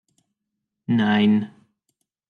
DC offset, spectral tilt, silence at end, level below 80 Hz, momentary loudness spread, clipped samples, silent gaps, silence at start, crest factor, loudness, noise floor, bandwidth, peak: under 0.1%; -8 dB/octave; 0.85 s; -72 dBFS; 19 LU; under 0.1%; none; 0.9 s; 16 dB; -20 LUFS; -81 dBFS; 4.9 kHz; -8 dBFS